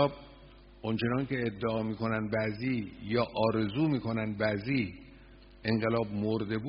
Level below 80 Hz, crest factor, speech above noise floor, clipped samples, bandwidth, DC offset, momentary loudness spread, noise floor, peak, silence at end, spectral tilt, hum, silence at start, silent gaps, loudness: -56 dBFS; 20 dB; 23 dB; under 0.1%; 5.4 kHz; under 0.1%; 6 LU; -54 dBFS; -12 dBFS; 0 s; -5.5 dB/octave; none; 0 s; none; -32 LUFS